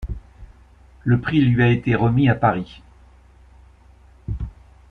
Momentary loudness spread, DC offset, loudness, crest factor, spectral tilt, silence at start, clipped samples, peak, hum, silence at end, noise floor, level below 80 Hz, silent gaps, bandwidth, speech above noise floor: 19 LU; under 0.1%; -19 LUFS; 18 dB; -9.5 dB/octave; 0 s; under 0.1%; -4 dBFS; none; 0.4 s; -49 dBFS; -38 dBFS; none; 4.7 kHz; 32 dB